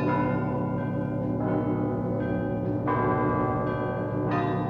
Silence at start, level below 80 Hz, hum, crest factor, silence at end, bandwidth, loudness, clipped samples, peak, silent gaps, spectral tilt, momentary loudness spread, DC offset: 0 s; -48 dBFS; none; 14 dB; 0 s; 5.2 kHz; -27 LUFS; under 0.1%; -12 dBFS; none; -10.5 dB/octave; 4 LU; under 0.1%